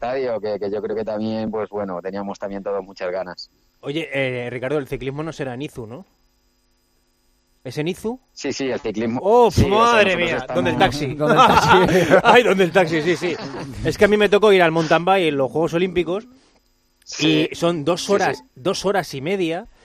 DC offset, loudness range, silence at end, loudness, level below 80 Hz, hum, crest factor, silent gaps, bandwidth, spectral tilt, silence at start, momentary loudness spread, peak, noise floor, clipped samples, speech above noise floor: under 0.1%; 14 LU; 0.2 s; -19 LUFS; -44 dBFS; none; 20 dB; none; 14 kHz; -5 dB/octave; 0 s; 15 LU; 0 dBFS; -63 dBFS; under 0.1%; 44 dB